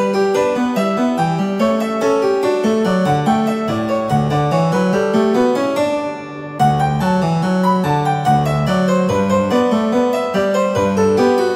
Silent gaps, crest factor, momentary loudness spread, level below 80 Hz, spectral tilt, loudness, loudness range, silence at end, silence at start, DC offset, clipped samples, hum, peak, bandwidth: none; 12 dB; 3 LU; -46 dBFS; -6.5 dB/octave; -16 LUFS; 1 LU; 0 s; 0 s; under 0.1%; under 0.1%; none; -2 dBFS; 15.5 kHz